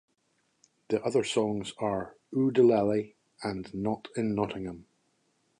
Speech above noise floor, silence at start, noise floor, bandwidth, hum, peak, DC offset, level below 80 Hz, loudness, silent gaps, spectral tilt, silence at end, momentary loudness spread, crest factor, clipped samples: 46 dB; 0.9 s; -74 dBFS; 11 kHz; none; -12 dBFS; under 0.1%; -62 dBFS; -29 LUFS; none; -6 dB/octave; 0.75 s; 15 LU; 18 dB; under 0.1%